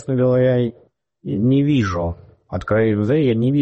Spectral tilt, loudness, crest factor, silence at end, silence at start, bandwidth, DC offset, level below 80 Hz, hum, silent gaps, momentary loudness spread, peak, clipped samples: -8.5 dB/octave; -18 LUFS; 12 dB; 0 s; 0 s; 8.2 kHz; under 0.1%; -44 dBFS; none; none; 13 LU; -6 dBFS; under 0.1%